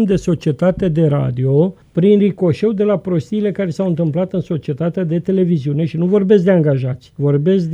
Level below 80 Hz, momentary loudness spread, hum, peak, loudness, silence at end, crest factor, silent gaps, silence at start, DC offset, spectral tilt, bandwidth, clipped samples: -46 dBFS; 7 LU; none; 0 dBFS; -16 LUFS; 0 s; 14 dB; none; 0 s; under 0.1%; -9 dB/octave; 8 kHz; under 0.1%